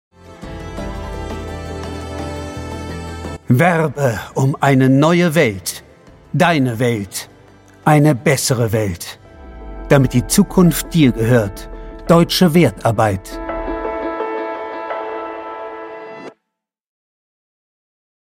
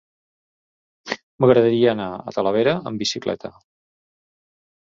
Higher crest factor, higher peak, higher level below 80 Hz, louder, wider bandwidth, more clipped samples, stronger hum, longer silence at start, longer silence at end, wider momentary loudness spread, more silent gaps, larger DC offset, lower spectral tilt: about the same, 16 dB vs 20 dB; about the same, 0 dBFS vs -2 dBFS; first, -36 dBFS vs -60 dBFS; first, -16 LUFS vs -20 LUFS; first, 17 kHz vs 7.8 kHz; neither; neither; second, 0.25 s vs 1.05 s; first, 1.9 s vs 1.35 s; first, 19 LU vs 15 LU; second, none vs 1.23-1.38 s; neither; about the same, -5.5 dB/octave vs -5.5 dB/octave